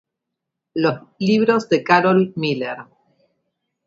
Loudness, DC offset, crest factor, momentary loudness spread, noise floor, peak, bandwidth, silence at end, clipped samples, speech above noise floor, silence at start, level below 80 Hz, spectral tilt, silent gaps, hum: -18 LUFS; under 0.1%; 20 dB; 13 LU; -81 dBFS; 0 dBFS; 7.8 kHz; 1.05 s; under 0.1%; 63 dB; 0.75 s; -66 dBFS; -6.5 dB/octave; none; none